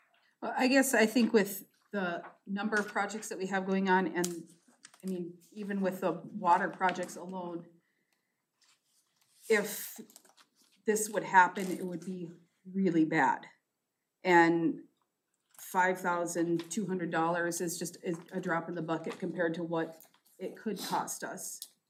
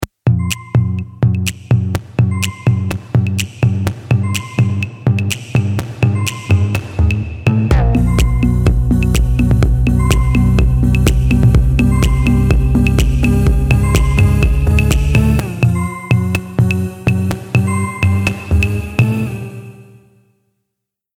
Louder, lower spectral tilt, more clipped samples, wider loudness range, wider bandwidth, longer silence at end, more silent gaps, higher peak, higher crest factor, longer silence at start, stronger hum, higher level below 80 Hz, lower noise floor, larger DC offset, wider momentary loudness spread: second, -32 LUFS vs -15 LUFS; second, -4.5 dB/octave vs -6.5 dB/octave; neither; about the same, 6 LU vs 4 LU; about the same, 16.5 kHz vs 16.5 kHz; second, 0.25 s vs 1.35 s; neither; second, -10 dBFS vs 0 dBFS; first, 24 dB vs 14 dB; first, 0.4 s vs 0 s; neither; second, under -90 dBFS vs -18 dBFS; first, -85 dBFS vs -78 dBFS; neither; first, 15 LU vs 5 LU